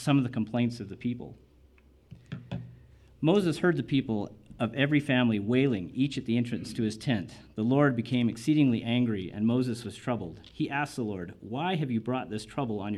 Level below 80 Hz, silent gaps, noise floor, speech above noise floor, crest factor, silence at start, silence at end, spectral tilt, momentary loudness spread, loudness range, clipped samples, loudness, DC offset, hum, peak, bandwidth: -60 dBFS; none; -59 dBFS; 31 dB; 18 dB; 0 s; 0 s; -7 dB/octave; 14 LU; 5 LU; under 0.1%; -29 LUFS; under 0.1%; none; -12 dBFS; 12.5 kHz